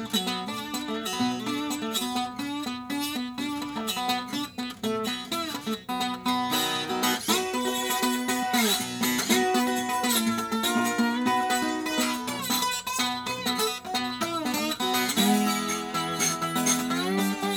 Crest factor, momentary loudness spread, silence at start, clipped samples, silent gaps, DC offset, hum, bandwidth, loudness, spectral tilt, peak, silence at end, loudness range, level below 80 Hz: 18 dB; 8 LU; 0 s; under 0.1%; none; under 0.1%; none; over 20 kHz; -27 LUFS; -2.5 dB/octave; -10 dBFS; 0 s; 5 LU; -64 dBFS